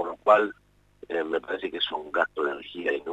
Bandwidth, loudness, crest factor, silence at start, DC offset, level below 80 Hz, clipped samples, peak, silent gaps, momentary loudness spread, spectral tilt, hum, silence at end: 8.8 kHz; -27 LUFS; 22 dB; 0 s; under 0.1%; -66 dBFS; under 0.1%; -6 dBFS; none; 11 LU; -4.5 dB/octave; 50 Hz at -65 dBFS; 0 s